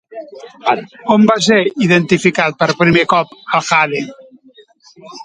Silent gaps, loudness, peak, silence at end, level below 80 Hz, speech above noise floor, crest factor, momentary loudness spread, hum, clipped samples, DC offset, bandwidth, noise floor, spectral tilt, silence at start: none; -13 LUFS; 0 dBFS; 0 s; -54 dBFS; 32 dB; 14 dB; 12 LU; none; under 0.1%; under 0.1%; 10 kHz; -46 dBFS; -5 dB/octave; 0.1 s